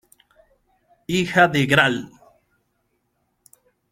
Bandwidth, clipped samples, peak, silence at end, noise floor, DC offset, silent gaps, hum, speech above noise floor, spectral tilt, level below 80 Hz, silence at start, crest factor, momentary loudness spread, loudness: 16 kHz; under 0.1%; -2 dBFS; 1.85 s; -71 dBFS; under 0.1%; none; none; 52 dB; -5 dB/octave; -56 dBFS; 1.1 s; 22 dB; 22 LU; -18 LUFS